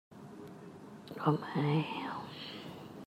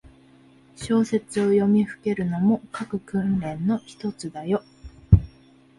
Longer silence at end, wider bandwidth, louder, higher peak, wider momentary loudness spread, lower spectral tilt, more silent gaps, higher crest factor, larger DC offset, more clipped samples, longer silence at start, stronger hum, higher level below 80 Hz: second, 0 s vs 0.5 s; first, 14 kHz vs 11.5 kHz; second, -36 LUFS vs -24 LUFS; second, -18 dBFS vs 0 dBFS; first, 18 LU vs 12 LU; about the same, -7.5 dB/octave vs -8 dB/octave; neither; about the same, 20 dB vs 22 dB; neither; neither; second, 0.1 s vs 0.8 s; neither; second, -76 dBFS vs -36 dBFS